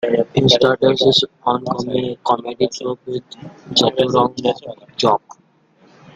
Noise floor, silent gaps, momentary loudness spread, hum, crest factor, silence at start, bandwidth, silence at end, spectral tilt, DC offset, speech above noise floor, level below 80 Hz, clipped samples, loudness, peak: -54 dBFS; none; 15 LU; none; 18 dB; 0 s; 9.2 kHz; 1 s; -5 dB/octave; under 0.1%; 36 dB; -52 dBFS; under 0.1%; -17 LUFS; 0 dBFS